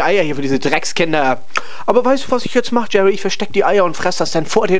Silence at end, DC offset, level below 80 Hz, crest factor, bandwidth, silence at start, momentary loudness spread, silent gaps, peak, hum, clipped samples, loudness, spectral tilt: 0 s; 10%; -52 dBFS; 16 dB; 10 kHz; 0 s; 4 LU; none; 0 dBFS; none; under 0.1%; -16 LUFS; -4.5 dB/octave